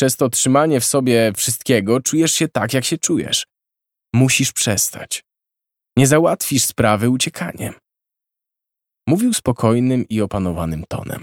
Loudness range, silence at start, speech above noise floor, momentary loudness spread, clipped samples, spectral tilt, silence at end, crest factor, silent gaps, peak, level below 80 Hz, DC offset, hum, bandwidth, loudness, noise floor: 4 LU; 0 s; 67 dB; 12 LU; under 0.1%; -4 dB/octave; 0 s; 18 dB; none; 0 dBFS; -46 dBFS; under 0.1%; none; 18 kHz; -17 LUFS; -84 dBFS